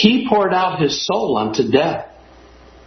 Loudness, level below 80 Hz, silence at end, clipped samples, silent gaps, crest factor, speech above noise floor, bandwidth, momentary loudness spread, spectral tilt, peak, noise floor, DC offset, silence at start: -17 LUFS; -50 dBFS; 0.8 s; under 0.1%; none; 18 dB; 28 dB; 6.4 kHz; 6 LU; -5 dB/octave; 0 dBFS; -44 dBFS; under 0.1%; 0 s